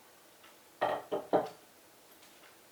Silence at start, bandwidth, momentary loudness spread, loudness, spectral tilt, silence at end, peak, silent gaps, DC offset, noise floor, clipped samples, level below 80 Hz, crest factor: 0.45 s; over 20 kHz; 25 LU; -35 LUFS; -5 dB/octave; 0.25 s; -16 dBFS; none; under 0.1%; -60 dBFS; under 0.1%; -82 dBFS; 24 dB